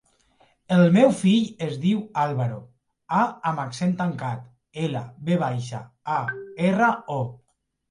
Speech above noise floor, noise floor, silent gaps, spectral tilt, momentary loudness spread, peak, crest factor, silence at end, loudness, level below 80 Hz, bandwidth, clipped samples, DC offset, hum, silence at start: 39 dB; -62 dBFS; none; -7 dB/octave; 14 LU; -4 dBFS; 18 dB; 0.55 s; -23 LUFS; -66 dBFS; 11 kHz; under 0.1%; under 0.1%; none; 0.7 s